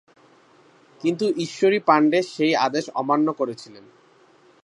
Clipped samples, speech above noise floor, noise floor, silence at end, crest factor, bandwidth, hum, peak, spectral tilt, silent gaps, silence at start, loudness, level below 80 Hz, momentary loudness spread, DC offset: under 0.1%; 34 dB; -55 dBFS; 0.85 s; 20 dB; 11 kHz; none; -2 dBFS; -5 dB/octave; none; 1.05 s; -21 LUFS; -78 dBFS; 10 LU; under 0.1%